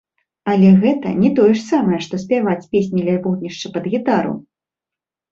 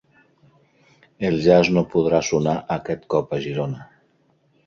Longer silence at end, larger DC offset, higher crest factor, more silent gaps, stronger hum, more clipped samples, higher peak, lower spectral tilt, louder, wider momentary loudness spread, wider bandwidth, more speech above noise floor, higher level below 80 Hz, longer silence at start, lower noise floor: about the same, 0.9 s vs 0.8 s; neither; second, 14 dB vs 20 dB; neither; neither; neither; about the same, -2 dBFS vs -2 dBFS; first, -7.5 dB/octave vs -6 dB/octave; first, -16 LUFS vs -21 LUFS; about the same, 13 LU vs 11 LU; about the same, 7.4 kHz vs 7.2 kHz; first, 72 dB vs 42 dB; about the same, -56 dBFS vs -52 dBFS; second, 0.45 s vs 1.2 s; first, -87 dBFS vs -62 dBFS